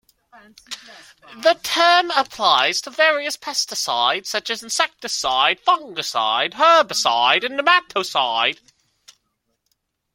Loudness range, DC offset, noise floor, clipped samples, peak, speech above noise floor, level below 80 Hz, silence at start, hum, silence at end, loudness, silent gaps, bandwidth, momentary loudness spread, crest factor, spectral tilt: 3 LU; under 0.1%; -72 dBFS; under 0.1%; 0 dBFS; 52 dB; -66 dBFS; 0.7 s; none; 1.6 s; -18 LUFS; none; 16.5 kHz; 9 LU; 20 dB; 0 dB/octave